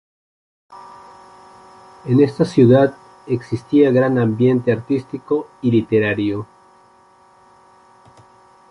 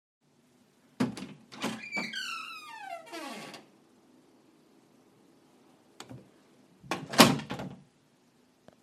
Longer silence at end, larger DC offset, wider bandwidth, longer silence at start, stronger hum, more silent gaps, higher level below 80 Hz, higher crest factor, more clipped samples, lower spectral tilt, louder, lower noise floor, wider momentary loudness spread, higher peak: first, 2.25 s vs 1 s; neither; second, 11 kHz vs 15.5 kHz; second, 0.7 s vs 1 s; neither; neither; first, -56 dBFS vs -70 dBFS; second, 16 dB vs 34 dB; neither; first, -8.5 dB/octave vs -3.5 dB/octave; first, -17 LUFS vs -30 LUFS; second, -51 dBFS vs -66 dBFS; second, 12 LU vs 27 LU; about the same, -2 dBFS vs -2 dBFS